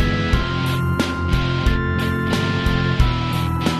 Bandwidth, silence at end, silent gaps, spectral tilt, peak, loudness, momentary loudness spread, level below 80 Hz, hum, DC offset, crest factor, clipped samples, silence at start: 14 kHz; 0 s; none; -6 dB/octave; -2 dBFS; -20 LUFS; 2 LU; -24 dBFS; none; under 0.1%; 16 dB; under 0.1%; 0 s